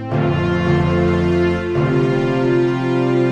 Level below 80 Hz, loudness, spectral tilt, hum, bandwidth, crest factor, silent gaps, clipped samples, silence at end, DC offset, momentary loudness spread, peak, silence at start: -38 dBFS; -17 LUFS; -8.5 dB/octave; none; 8.2 kHz; 12 dB; none; under 0.1%; 0 s; under 0.1%; 2 LU; -4 dBFS; 0 s